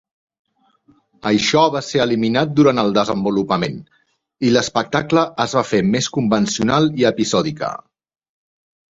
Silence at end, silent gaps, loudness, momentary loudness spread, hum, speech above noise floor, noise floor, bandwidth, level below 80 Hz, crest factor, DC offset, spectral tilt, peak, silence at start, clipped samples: 1.15 s; none; -17 LUFS; 8 LU; none; 40 dB; -57 dBFS; 8 kHz; -52 dBFS; 18 dB; under 0.1%; -5 dB/octave; 0 dBFS; 1.25 s; under 0.1%